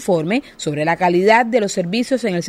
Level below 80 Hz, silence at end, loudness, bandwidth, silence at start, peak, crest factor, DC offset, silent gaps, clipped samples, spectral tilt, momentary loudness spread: -56 dBFS; 0 s; -17 LUFS; 15 kHz; 0 s; 0 dBFS; 16 dB; under 0.1%; none; under 0.1%; -5 dB/octave; 8 LU